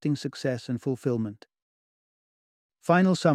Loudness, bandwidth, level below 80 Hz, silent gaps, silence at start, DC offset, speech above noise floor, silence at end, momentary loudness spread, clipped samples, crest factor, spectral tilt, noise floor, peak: -27 LUFS; 12.5 kHz; -72 dBFS; 1.62-2.69 s; 0.05 s; under 0.1%; over 65 dB; 0 s; 11 LU; under 0.1%; 20 dB; -6.5 dB/octave; under -90 dBFS; -8 dBFS